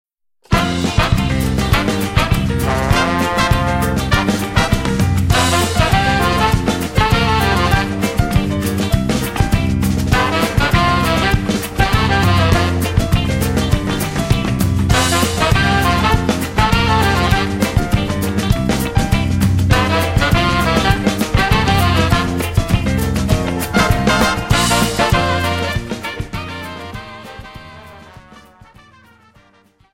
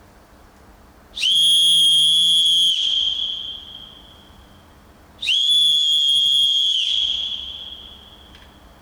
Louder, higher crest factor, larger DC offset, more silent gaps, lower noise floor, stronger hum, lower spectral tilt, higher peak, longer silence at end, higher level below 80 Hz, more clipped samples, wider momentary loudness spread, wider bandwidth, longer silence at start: about the same, -15 LUFS vs -14 LUFS; about the same, 14 dB vs 12 dB; neither; neither; first, -52 dBFS vs -48 dBFS; neither; first, -5 dB/octave vs 1.5 dB/octave; first, 0 dBFS vs -8 dBFS; first, 1.55 s vs 0.85 s; first, -24 dBFS vs -54 dBFS; neither; second, 5 LU vs 19 LU; second, 16.5 kHz vs over 20 kHz; second, 0.5 s vs 1.15 s